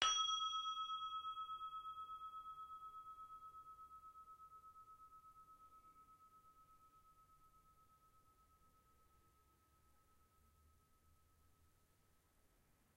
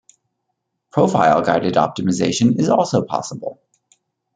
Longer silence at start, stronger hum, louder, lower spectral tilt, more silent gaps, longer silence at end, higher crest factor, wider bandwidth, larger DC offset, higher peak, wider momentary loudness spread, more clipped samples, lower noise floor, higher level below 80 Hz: second, 0 s vs 0.95 s; neither; second, -46 LUFS vs -17 LUFS; second, 1.5 dB/octave vs -5.5 dB/octave; neither; first, 1.85 s vs 0.8 s; first, 34 dB vs 16 dB; first, 16 kHz vs 9.4 kHz; neither; second, -18 dBFS vs -2 dBFS; first, 25 LU vs 11 LU; neither; about the same, -77 dBFS vs -75 dBFS; second, -78 dBFS vs -58 dBFS